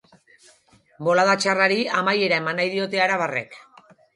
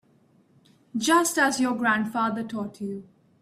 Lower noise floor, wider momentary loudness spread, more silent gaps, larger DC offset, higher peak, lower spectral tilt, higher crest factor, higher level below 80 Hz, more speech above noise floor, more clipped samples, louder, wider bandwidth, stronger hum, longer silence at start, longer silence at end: second, -57 dBFS vs -61 dBFS; second, 9 LU vs 14 LU; neither; neither; first, -4 dBFS vs -8 dBFS; about the same, -4 dB/octave vs -3 dB/octave; about the same, 18 dB vs 18 dB; about the same, -72 dBFS vs -70 dBFS; about the same, 36 dB vs 37 dB; neither; first, -21 LUFS vs -25 LUFS; second, 11.5 kHz vs 15.5 kHz; neither; about the same, 1 s vs 0.95 s; first, 0.55 s vs 0.4 s